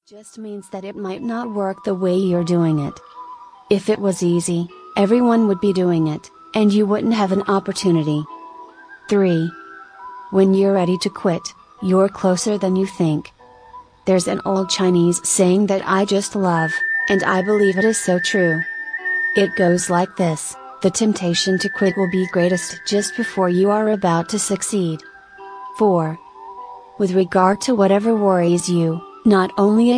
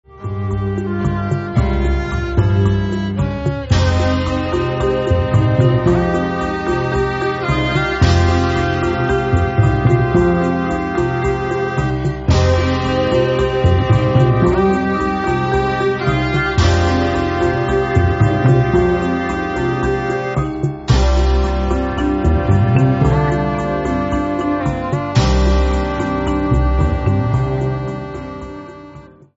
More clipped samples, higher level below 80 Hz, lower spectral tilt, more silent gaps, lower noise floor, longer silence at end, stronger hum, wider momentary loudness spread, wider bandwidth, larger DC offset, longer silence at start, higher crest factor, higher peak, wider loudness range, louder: neither; second, -58 dBFS vs -22 dBFS; second, -5 dB/octave vs -7.5 dB/octave; neither; about the same, -42 dBFS vs -39 dBFS; second, 0 s vs 0.3 s; neither; first, 15 LU vs 6 LU; first, 10.5 kHz vs 8 kHz; neither; about the same, 0.15 s vs 0.15 s; about the same, 16 dB vs 14 dB; about the same, -2 dBFS vs 0 dBFS; about the same, 4 LU vs 2 LU; about the same, -18 LUFS vs -16 LUFS